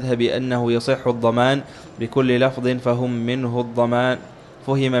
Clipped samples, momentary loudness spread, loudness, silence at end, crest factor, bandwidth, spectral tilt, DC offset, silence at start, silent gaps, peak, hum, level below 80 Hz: under 0.1%; 7 LU; -20 LUFS; 0 s; 14 dB; 11.5 kHz; -7 dB/octave; under 0.1%; 0 s; none; -6 dBFS; none; -54 dBFS